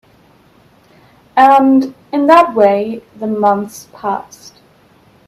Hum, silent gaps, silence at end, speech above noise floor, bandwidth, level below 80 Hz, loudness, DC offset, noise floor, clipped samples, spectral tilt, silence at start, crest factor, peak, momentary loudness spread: none; none; 1.05 s; 36 dB; 13.5 kHz; -58 dBFS; -12 LUFS; under 0.1%; -48 dBFS; under 0.1%; -6 dB/octave; 1.35 s; 14 dB; 0 dBFS; 15 LU